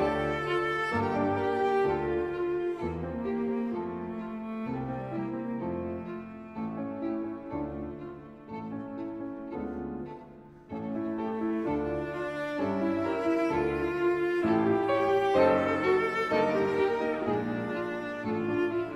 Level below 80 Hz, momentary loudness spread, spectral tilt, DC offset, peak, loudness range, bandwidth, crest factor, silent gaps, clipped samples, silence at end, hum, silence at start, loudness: -54 dBFS; 12 LU; -7.5 dB/octave; under 0.1%; -12 dBFS; 11 LU; 10.5 kHz; 18 dB; none; under 0.1%; 0 s; none; 0 s; -30 LUFS